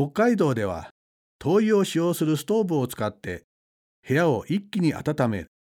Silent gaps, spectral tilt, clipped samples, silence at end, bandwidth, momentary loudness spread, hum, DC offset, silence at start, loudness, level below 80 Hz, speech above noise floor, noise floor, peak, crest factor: 0.91-1.39 s, 3.44-4.03 s; -6.5 dB/octave; under 0.1%; 0.2 s; 17.5 kHz; 10 LU; none; under 0.1%; 0 s; -24 LUFS; -56 dBFS; over 67 dB; under -90 dBFS; -8 dBFS; 16 dB